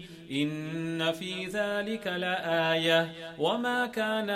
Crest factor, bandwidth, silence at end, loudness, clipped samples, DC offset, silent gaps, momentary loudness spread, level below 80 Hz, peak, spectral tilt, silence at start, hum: 18 dB; 15.5 kHz; 0 s; -30 LUFS; under 0.1%; under 0.1%; none; 8 LU; -68 dBFS; -12 dBFS; -5 dB/octave; 0 s; none